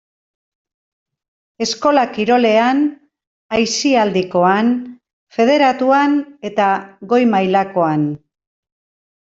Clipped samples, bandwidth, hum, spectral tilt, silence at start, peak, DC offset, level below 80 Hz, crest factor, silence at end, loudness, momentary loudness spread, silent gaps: under 0.1%; 7.8 kHz; none; -4.5 dB/octave; 1.6 s; -2 dBFS; under 0.1%; -60 dBFS; 14 dB; 1.05 s; -15 LUFS; 10 LU; 3.27-3.49 s, 5.13-5.27 s